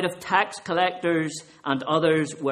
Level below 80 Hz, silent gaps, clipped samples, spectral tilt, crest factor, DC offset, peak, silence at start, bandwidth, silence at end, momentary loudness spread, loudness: -68 dBFS; none; under 0.1%; -4.5 dB/octave; 20 dB; under 0.1%; -6 dBFS; 0 s; 13 kHz; 0 s; 7 LU; -24 LUFS